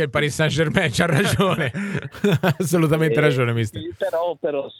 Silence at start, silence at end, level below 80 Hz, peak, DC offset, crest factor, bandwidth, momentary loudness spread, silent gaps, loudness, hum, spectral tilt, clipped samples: 0 s; 0.1 s; -48 dBFS; -4 dBFS; under 0.1%; 16 dB; 18 kHz; 7 LU; none; -20 LUFS; none; -5.5 dB/octave; under 0.1%